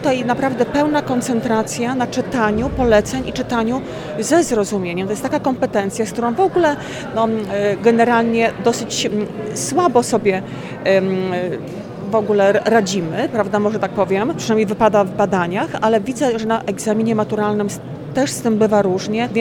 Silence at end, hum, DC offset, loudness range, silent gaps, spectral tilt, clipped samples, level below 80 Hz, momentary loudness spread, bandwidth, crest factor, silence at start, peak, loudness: 0 s; none; under 0.1%; 2 LU; none; -5 dB/octave; under 0.1%; -44 dBFS; 8 LU; 18 kHz; 16 dB; 0 s; 0 dBFS; -18 LUFS